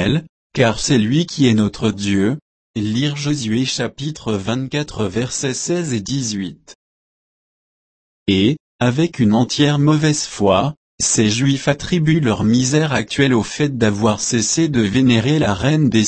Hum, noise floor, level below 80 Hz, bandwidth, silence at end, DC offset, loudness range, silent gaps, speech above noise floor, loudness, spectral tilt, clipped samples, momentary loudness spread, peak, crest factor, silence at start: none; under -90 dBFS; -44 dBFS; 8.8 kHz; 0 s; under 0.1%; 6 LU; 0.29-0.50 s, 2.42-2.74 s, 6.75-8.26 s, 8.60-8.79 s, 10.77-10.98 s; over 74 dB; -17 LUFS; -5 dB/octave; under 0.1%; 8 LU; -2 dBFS; 16 dB; 0 s